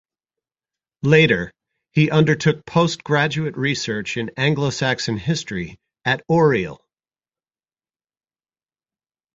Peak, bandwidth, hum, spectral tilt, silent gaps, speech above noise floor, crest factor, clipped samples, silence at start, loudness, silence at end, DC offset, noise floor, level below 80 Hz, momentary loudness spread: -2 dBFS; 7.8 kHz; none; -5.5 dB/octave; none; over 71 dB; 20 dB; under 0.1%; 1.05 s; -19 LUFS; 2.6 s; under 0.1%; under -90 dBFS; -52 dBFS; 10 LU